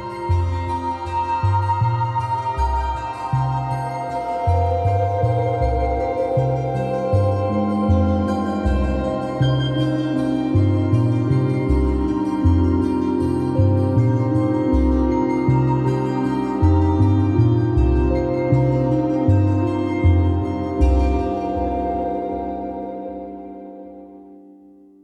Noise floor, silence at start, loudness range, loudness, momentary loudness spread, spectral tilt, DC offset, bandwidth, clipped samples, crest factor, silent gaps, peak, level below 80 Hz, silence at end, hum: -47 dBFS; 0 s; 4 LU; -20 LUFS; 7 LU; -9 dB/octave; under 0.1%; 9.2 kHz; under 0.1%; 14 dB; none; -4 dBFS; -28 dBFS; 0.65 s; none